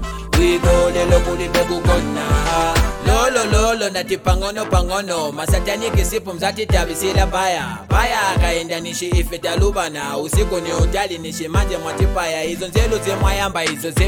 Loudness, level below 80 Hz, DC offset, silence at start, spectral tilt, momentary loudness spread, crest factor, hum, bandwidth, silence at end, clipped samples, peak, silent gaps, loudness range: -18 LUFS; -22 dBFS; under 0.1%; 0 s; -4.5 dB/octave; 6 LU; 16 dB; none; 19 kHz; 0 s; under 0.1%; 0 dBFS; none; 3 LU